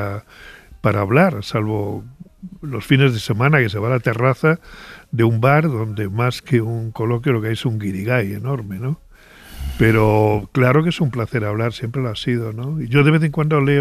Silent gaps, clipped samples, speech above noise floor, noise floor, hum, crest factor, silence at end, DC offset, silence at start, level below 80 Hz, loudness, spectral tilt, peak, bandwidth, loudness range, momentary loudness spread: none; under 0.1%; 26 dB; -43 dBFS; none; 18 dB; 0 s; under 0.1%; 0 s; -40 dBFS; -18 LUFS; -7.5 dB/octave; -2 dBFS; 14.5 kHz; 3 LU; 13 LU